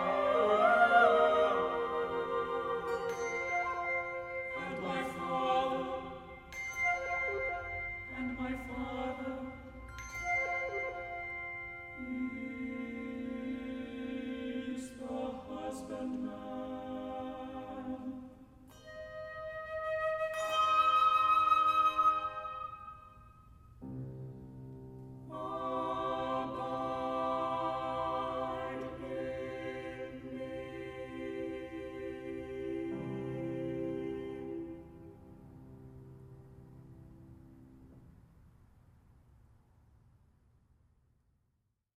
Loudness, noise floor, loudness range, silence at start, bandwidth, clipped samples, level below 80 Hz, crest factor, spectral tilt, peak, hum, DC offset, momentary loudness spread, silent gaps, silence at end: -35 LUFS; -80 dBFS; 14 LU; 0 s; 15.5 kHz; under 0.1%; -60 dBFS; 22 dB; -5 dB/octave; -14 dBFS; none; under 0.1%; 22 LU; none; 3.5 s